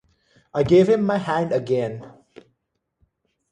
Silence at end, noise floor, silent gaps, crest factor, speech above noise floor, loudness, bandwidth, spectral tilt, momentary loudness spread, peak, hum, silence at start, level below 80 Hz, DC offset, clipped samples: 1.4 s; -76 dBFS; none; 18 dB; 56 dB; -20 LUFS; 9.6 kHz; -7.5 dB/octave; 14 LU; -6 dBFS; none; 0.55 s; -54 dBFS; under 0.1%; under 0.1%